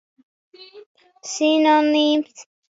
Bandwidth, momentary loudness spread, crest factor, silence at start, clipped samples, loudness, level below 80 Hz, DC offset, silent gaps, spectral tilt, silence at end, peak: 7.8 kHz; 18 LU; 16 dB; 0.75 s; under 0.1%; -18 LUFS; -78 dBFS; under 0.1%; 0.86-0.95 s; -1.5 dB/octave; 0.3 s; -6 dBFS